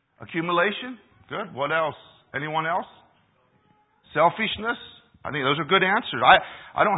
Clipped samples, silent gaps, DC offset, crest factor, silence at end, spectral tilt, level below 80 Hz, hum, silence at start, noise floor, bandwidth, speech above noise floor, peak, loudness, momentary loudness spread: under 0.1%; none; under 0.1%; 24 dB; 0 s; -9 dB/octave; -60 dBFS; none; 0.2 s; -64 dBFS; 4 kHz; 40 dB; 0 dBFS; -23 LUFS; 16 LU